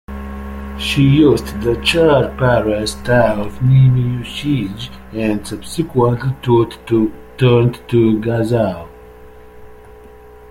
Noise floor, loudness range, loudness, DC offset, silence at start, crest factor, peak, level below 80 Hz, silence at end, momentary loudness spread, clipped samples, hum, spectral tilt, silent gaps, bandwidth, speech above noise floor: -39 dBFS; 4 LU; -15 LUFS; under 0.1%; 0.1 s; 16 dB; 0 dBFS; -34 dBFS; 0 s; 13 LU; under 0.1%; none; -7 dB/octave; none; 14.5 kHz; 25 dB